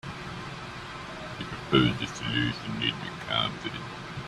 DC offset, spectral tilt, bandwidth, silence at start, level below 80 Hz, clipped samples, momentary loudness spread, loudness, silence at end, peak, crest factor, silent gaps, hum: under 0.1%; -5 dB/octave; 12.5 kHz; 0.05 s; -52 dBFS; under 0.1%; 15 LU; -30 LUFS; 0 s; -8 dBFS; 22 dB; none; none